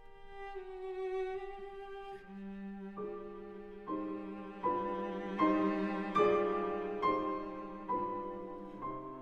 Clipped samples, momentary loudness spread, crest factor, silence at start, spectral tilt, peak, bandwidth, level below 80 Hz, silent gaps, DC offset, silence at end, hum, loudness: under 0.1%; 16 LU; 20 dB; 0 s; -7.5 dB/octave; -18 dBFS; 8 kHz; -60 dBFS; none; under 0.1%; 0 s; none; -37 LUFS